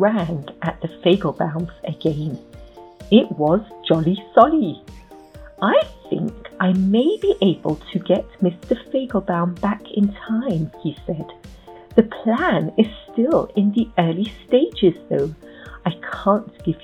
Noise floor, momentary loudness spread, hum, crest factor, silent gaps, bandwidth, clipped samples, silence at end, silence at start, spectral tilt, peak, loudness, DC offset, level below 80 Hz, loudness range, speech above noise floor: -41 dBFS; 11 LU; none; 20 dB; none; 8.6 kHz; under 0.1%; 0.05 s; 0 s; -8.5 dB/octave; 0 dBFS; -20 LUFS; under 0.1%; -46 dBFS; 3 LU; 22 dB